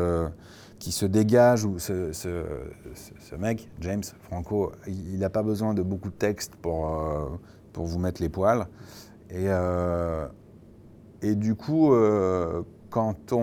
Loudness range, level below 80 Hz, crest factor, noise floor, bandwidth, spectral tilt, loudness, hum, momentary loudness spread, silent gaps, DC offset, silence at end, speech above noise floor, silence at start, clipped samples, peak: 5 LU; -46 dBFS; 20 dB; -50 dBFS; over 20 kHz; -6.5 dB/octave; -27 LUFS; none; 19 LU; none; under 0.1%; 0 s; 24 dB; 0 s; under 0.1%; -8 dBFS